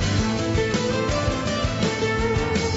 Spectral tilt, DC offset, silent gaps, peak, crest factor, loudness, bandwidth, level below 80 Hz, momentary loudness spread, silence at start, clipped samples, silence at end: -5 dB/octave; under 0.1%; none; -10 dBFS; 12 dB; -23 LUFS; 8 kHz; -34 dBFS; 1 LU; 0 s; under 0.1%; 0 s